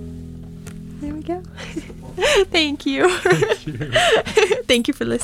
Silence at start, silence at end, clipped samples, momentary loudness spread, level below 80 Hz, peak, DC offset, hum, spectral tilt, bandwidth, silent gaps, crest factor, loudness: 0 s; 0 s; under 0.1%; 20 LU; -42 dBFS; -4 dBFS; under 0.1%; none; -4 dB/octave; 17 kHz; none; 16 dB; -18 LUFS